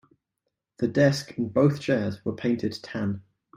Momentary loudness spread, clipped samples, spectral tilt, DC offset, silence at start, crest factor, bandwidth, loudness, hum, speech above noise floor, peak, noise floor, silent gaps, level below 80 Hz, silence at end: 9 LU; under 0.1%; -7 dB/octave; under 0.1%; 0.8 s; 20 dB; 14.5 kHz; -26 LUFS; none; 57 dB; -8 dBFS; -82 dBFS; none; -62 dBFS; 0.35 s